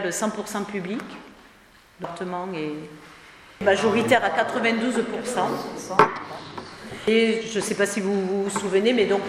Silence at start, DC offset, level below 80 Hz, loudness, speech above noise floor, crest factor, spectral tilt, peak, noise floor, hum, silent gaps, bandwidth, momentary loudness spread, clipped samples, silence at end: 0 s; under 0.1%; -62 dBFS; -23 LUFS; 29 dB; 24 dB; -4 dB/octave; 0 dBFS; -53 dBFS; none; none; 15 kHz; 17 LU; under 0.1%; 0 s